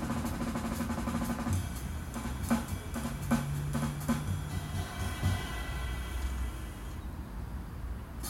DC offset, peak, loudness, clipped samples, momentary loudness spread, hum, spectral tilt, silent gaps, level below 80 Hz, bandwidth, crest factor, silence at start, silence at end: under 0.1%; -16 dBFS; -36 LUFS; under 0.1%; 9 LU; none; -5.5 dB/octave; none; -42 dBFS; 16 kHz; 20 dB; 0 s; 0 s